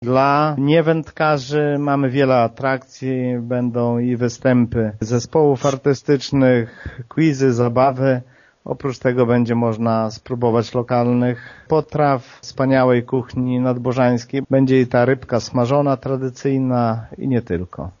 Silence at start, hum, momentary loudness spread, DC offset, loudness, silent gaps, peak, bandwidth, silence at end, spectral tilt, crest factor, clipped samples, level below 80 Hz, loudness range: 0 s; none; 8 LU; under 0.1%; -18 LUFS; none; -2 dBFS; 7.4 kHz; 0.1 s; -6.5 dB/octave; 16 dB; under 0.1%; -48 dBFS; 2 LU